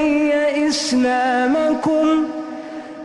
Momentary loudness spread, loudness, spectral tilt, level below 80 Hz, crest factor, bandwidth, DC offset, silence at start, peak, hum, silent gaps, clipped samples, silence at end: 13 LU; -17 LUFS; -3.5 dB/octave; -52 dBFS; 10 dB; 11.5 kHz; under 0.1%; 0 s; -8 dBFS; none; none; under 0.1%; 0 s